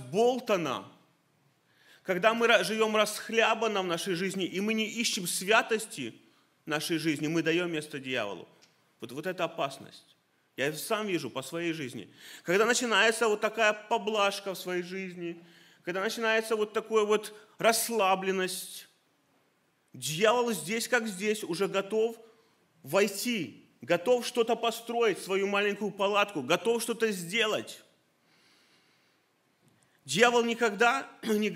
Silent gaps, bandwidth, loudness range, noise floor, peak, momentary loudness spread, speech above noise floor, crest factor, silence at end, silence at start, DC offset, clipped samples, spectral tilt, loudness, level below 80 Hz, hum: none; 16 kHz; 6 LU; -71 dBFS; -6 dBFS; 13 LU; 42 dB; 24 dB; 0 s; 0 s; under 0.1%; under 0.1%; -3 dB/octave; -29 LUFS; -84 dBFS; none